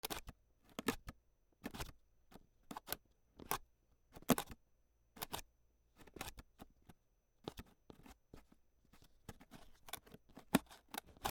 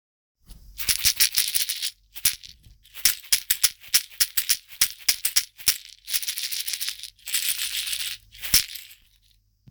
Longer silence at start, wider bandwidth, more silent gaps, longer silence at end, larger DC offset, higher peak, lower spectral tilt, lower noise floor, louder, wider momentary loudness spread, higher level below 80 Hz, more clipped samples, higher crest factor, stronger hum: second, 0.05 s vs 0.5 s; about the same, over 20 kHz vs over 20 kHz; neither; second, 0 s vs 0.75 s; neither; second, -14 dBFS vs 0 dBFS; first, -4 dB/octave vs 2.5 dB/octave; first, -76 dBFS vs -63 dBFS; second, -45 LUFS vs -22 LUFS; first, 25 LU vs 11 LU; second, -64 dBFS vs -52 dBFS; neither; first, 34 dB vs 26 dB; neither